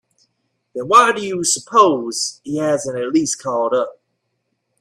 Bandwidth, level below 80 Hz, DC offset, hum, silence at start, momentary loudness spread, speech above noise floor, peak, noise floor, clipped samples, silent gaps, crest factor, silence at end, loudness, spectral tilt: 14.5 kHz; -64 dBFS; under 0.1%; none; 0.75 s; 10 LU; 55 dB; 0 dBFS; -72 dBFS; under 0.1%; none; 18 dB; 0.9 s; -17 LUFS; -3 dB/octave